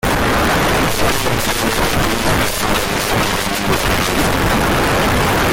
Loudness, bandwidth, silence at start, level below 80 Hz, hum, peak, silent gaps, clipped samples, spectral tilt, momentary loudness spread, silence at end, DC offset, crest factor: -15 LUFS; 17 kHz; 0.05 s; -26 dBFS; none; -4 dBFS; none; under 0.1%; -4 dB/octave; 2 LU; 0 s; under 0.1%; 12 dB